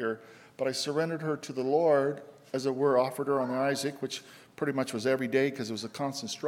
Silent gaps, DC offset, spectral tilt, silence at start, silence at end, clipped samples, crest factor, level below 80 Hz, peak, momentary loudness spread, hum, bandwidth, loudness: none; under 0.1%; -5 dB/octave; 0 s; 0 s; under 0.1%; 18 dB; -80 dBFS; -12 dBFS; 10 LU; none; 16.5 kHz; -30 LUFS